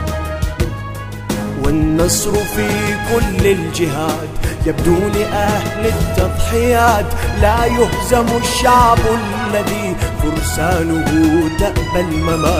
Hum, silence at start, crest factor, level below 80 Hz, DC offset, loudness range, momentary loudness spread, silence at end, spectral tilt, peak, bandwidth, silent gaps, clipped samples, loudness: none; 0 s; 14 dB; -24 dBFS; under 0.1%; 3 LU; 9 LU; 0 s; -5 dB/octave; 0 dBFS; 16 kHz; none; under 0.1%; -15 LUFS